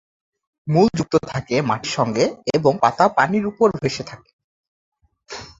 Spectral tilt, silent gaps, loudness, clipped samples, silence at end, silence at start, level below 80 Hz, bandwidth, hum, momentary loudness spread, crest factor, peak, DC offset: -5.5 dB/octave; 4.33-4.92 s; -19 LUFS; under 0.1%; 0.1 s; 0.65 s; -54 dBFS; 7.8 kHz; none; 14 LU; 18 dB; -2 dBFS; under 0.1%